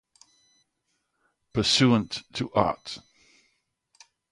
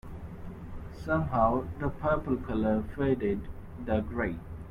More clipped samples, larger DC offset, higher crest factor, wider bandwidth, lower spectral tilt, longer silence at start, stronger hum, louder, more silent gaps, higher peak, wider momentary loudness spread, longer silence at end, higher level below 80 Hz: neither; neither; first, 24 dB vs 18 dB; second, 11.5 kHz vs 13.5 kHz; second, -4.5 dB/octave vs -9.5 dB/octave; first, 1.55 s vs 0.05 s; neither; first, -25 LUFS vs -30 LUFS; neither; first, -6 dBFS vs -12 dBFS; about the same, 17 LU vs 17 LU; first, 1.35 s vs 0 s; second, -56 dBFS vs -44 dBFS